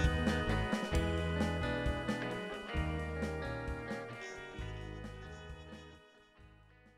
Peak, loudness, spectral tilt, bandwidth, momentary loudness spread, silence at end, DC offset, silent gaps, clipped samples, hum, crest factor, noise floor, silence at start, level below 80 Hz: -18 dBFS; -38 LUFS; -6 dB/octave; 13 kHz; 15 LU; 0.45 s; under 0.1%; none; under 0.1%; none; 20 dB; -62 dBFS; 0 s; -44 dBFS